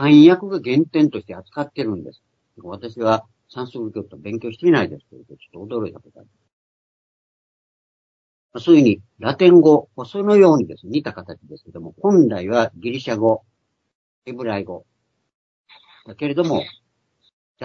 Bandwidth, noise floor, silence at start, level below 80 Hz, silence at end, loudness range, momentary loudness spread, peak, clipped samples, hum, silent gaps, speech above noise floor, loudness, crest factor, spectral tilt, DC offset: 6.6 kHz; -65 dBFS; 0 s; -64 dBFS; 0 s; 12 LU; 22 LU; 0 dBFS; under 0.1%; none; 6.53-8.49 s, 13.95-14.22 s, 15.35-15.64 s, 17.33-17.55 s; 48 dB; -17 LUFS; 18 dB; -7.5 dB/octave; under 0.1%